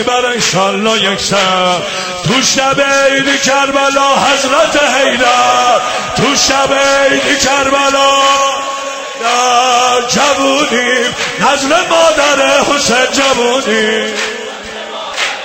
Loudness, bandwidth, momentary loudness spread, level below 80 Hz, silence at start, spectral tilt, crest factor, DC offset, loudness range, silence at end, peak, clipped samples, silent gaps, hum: -10 LUFS; 16.5 kHz; 7 LU; -44 dBFS; 0 s; -2 dB/octave; 10 dB; 0.2%; 1 LU; 0 s; 0 dBFS; under 0.1%; none; none